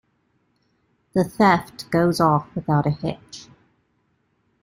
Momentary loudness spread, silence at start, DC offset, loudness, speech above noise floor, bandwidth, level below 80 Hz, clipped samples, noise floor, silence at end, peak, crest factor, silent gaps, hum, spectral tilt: 16 LU; 1.15 s; under 0.1%; -21 LUFS; 47 dB; 16 kHz; -54 dBFS; under 0.1%; -68 dBFS; 1.2 s; -2 dBFS; 22 dB; none; none; -6.5 dB/octave